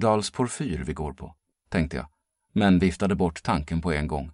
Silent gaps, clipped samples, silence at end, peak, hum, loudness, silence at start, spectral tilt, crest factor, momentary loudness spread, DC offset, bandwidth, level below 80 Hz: none; under 0.1%; 0 s; -8 dBFS; none; -26 LUFS; 0 s; -6 dB/octave; 18 dB; 14 LU; under 0.1%; 11.5 kHz; -40 dBFS